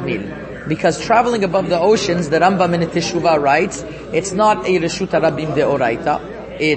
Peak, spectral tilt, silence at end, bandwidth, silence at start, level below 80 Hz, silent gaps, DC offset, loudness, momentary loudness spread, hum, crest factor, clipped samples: 0 dBFS; -5 dB/octave; 0 s; 8.8 kHz; 0 s; -44 dBFS; none; under 0.1%; -16 LUFS; 9 LU; none; 16 dB; under 0.1%